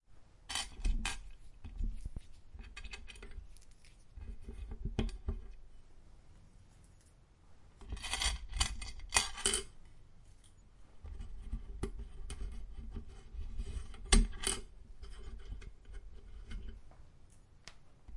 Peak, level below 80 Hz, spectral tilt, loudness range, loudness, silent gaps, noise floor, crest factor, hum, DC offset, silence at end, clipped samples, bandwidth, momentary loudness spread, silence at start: -10 dBFS; -42 dBFS; -2.5 dB/octave; 13 LU; -39 LUFS; none; -62 dBFS; 30 dB; none; under 0.1%; 0 s; under 0.1%; 11.5 kHz; 24 LU; 0.1 s